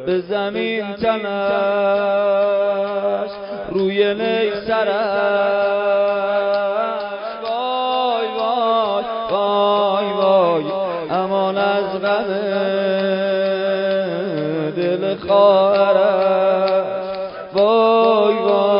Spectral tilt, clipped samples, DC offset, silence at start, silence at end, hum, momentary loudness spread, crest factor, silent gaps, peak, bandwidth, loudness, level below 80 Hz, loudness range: -10 dB/octave; under 0.1%; under 0.1%; 0 s; 0 s; none; 8 LU; 14 dB; none; -2 dBFS; 5.4 kHz; -18 LUFS; -58 dBFS; 3 LU